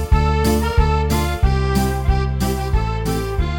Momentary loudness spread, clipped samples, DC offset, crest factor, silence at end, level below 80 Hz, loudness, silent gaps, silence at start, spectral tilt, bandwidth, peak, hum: 4 LU; under 0.1%; under 0.1%; 14 dB; 0 s; -20 dBFS; -19 LUFS; none; 0 s; -6 dB/octave; 19 kHz; -2 dBFS; none